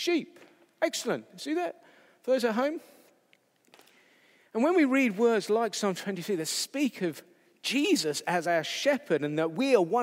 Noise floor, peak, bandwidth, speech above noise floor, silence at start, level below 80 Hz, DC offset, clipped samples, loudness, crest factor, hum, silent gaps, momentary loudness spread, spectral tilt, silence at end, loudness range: -67 dBFS; -10 dBFS; 16 kHz; 39 dB; 0 s; under -90 dBFS; under 0.1%; under 0.1%; -28 LUFS; 20 dB; none; none; 10 LU; -4 dB/octave; 0 s; 5 LU